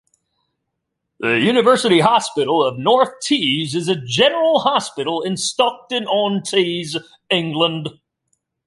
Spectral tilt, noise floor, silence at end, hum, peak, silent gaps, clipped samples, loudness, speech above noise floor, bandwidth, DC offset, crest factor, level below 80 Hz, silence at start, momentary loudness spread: -4 dB/octave; -77 dBFS; 0.75 s; none; -2 dBFS; none; under 0.1%; -17 LUFS; 59 dB; 11.5 kHz; under 0.1%; 16 dB; -64 dBFS; 1.2 s; 9 LU